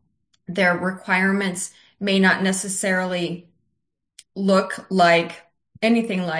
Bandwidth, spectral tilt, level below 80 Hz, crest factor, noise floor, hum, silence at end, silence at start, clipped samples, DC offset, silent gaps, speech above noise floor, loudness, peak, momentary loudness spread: 10.5 kHz; -4.5 dB/octave; -68 dBFS; 18 dB; -77 dBFS; none; 0 s; 0.5 s; under 0.1%; under 0.1%; none; 57 dB; -20 LUFS; -4 dBFS; 13 LU